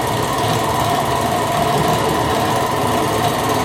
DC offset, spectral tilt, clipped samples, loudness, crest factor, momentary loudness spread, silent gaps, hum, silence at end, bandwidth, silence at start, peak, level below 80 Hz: under 0.1%; -4.5 dB/octave; under 0.1%; -17 LUFS; 12 dB; 1 LU; none; none; 0 s; 17.5 kHz; 0 s; -4 dBFS; -38 dBFS